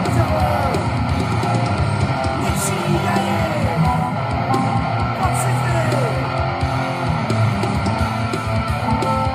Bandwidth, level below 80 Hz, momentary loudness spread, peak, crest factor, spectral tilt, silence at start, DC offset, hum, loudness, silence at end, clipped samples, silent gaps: 15.5 kHz; -32 dBFS; 3 LU; -4 dBFS; 14 dB; -6 dB/octave; 0 s; under 0.1%; none; -19 LUFS; 0 s; under 0.1%; none